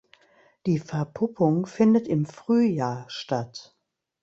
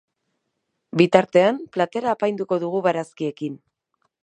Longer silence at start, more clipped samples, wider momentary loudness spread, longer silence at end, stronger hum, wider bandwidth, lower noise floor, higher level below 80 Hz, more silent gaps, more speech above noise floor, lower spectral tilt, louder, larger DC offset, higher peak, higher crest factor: second, 0.65 s vs 0.95 s; neither; about the same, 12 LU vs 13 LU; about the same, 0.6 s vs 0.7 s; neither; second, 7.8 kHz vs 10 kHz; second, -60 dBFS vs -76 dBFS; about the same, -64 dBFS vs -68 dBFS; neither; second, 36 dB vs 56 dB; about the same, -7.5 dB/octave vs -6.5 dB/octave; second, -25 LUFS vs -21 LUFS; neither; second, -8 dBFS vs 0 dBFS; about the same, 18 dB vs 22 dB